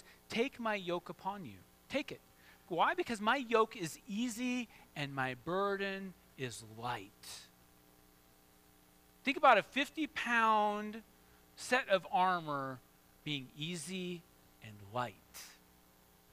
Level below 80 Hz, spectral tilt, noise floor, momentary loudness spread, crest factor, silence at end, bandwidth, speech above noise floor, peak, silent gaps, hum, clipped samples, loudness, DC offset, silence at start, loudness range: -72 dBFS; -4 dB/octave; -66 dBFS; 19 LU; 26 dB; 0.8 s; 15.5 kHz; 30 dB; -12 dBFS; none; none; under 0.1%; -36 LUFS; under 0.1%; 0.05 s; 11 LU